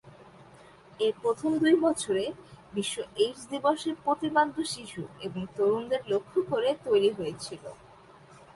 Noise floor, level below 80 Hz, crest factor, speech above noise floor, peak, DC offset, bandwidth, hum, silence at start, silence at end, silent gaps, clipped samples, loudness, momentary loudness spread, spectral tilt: -53 dBFS; -66 dBFS; 18 dB; 25 dB; -10 dBFS; under 0.1%; 11.5 kHz; none; 0.05 s; 0.15 s; none; under 0.1%; -29 LUFS; 13 LU; -4.5 dB/octave